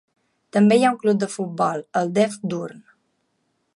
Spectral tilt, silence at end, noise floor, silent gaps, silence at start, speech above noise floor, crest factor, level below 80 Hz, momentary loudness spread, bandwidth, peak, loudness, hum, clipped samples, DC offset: -6 dB/octave; 1 s; -71 dBFS; none; 0.55 s; 51 dB; 16 dB; -72 dBFS; 12 LU; 11.5 kHz; -6 dBFS; -21 LUFS; none; under 0.1%; under 0.1%